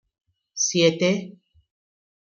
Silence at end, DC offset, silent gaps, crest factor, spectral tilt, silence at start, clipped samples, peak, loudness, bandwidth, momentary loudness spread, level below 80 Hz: 0.95 s; under 0.1%; none; 20 dB; -3.5 dB/octave; 0.55 s; under 0.1%; -6 dBFS; -21 LUFS; 7.4 kHz; 19 LU; -68 dBFS